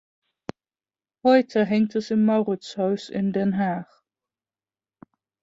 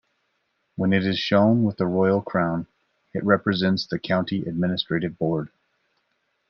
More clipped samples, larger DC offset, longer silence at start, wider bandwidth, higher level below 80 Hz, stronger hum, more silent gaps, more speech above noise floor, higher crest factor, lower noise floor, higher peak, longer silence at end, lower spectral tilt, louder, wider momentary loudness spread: neither; neither; first, 1.25 s vs 0.8 s; first, 7.8 kHz vs 6.6 kHz; about the same, -66 dBFS vs -62 dBFS; neither; neither; first, over 68 dB vs 50 dB; about the same, 20 dB vs 20 dB; first, under -90 dBFS vs -72 dBFS; about the same, -6 dBFS vs -4 dBFS; first, 1.6 s vs 1.05 s; about the same, -7.5 dB/octave vs -7.5 dB/octave; about the same, -23 LUFS vs -23 LUFS; first, 20 LU vs 10 LU